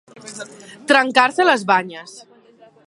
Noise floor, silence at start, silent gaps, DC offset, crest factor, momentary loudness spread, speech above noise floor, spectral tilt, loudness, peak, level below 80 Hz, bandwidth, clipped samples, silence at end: -49 dBFS; 0.25 s; none; under 0.1%; 20 dB; 22 LU; 33 dB; -3 dB/octave; -15 LUFS; 0 dBFS; -68 dBFS; 11.5 kHz; under 0.1%; 0.7 s